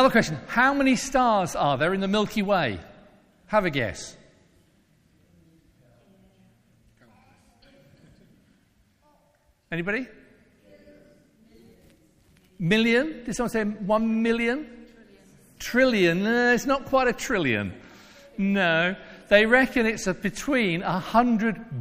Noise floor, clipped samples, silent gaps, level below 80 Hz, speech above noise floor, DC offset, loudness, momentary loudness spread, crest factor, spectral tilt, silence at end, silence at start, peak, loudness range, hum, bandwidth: -64 dBFS; under 0.1%; none; -50 dBFS; 41 dB; under 0.1%; -23 LUFS; 11 LU; 22 dB; -5 dB/octave; 0 s; 0 s; -4 dBFS; 14 LU; none; 15.5 kHz